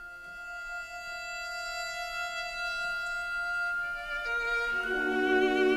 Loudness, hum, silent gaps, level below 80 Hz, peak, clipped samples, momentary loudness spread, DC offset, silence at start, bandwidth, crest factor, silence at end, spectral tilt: -32 LUFS; none; none; -54 dBFS; -14 dBFS; under 0.1%; 12 LU; under 0.1%; 0 s; 14 kHz; 18 dB; 0 s; -2.5 dB/octave